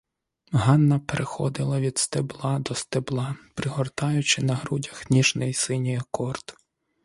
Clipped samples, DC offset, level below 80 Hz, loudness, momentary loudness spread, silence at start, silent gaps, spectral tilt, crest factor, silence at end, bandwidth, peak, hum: under 0.1%; under 0.1%; -56 dBFS; -25 LUFS; 10 LU; 0.5 s; none; -5 dB/octave; 22 dB; 0.5 s; 11.5 kHz; -4 dBFS; none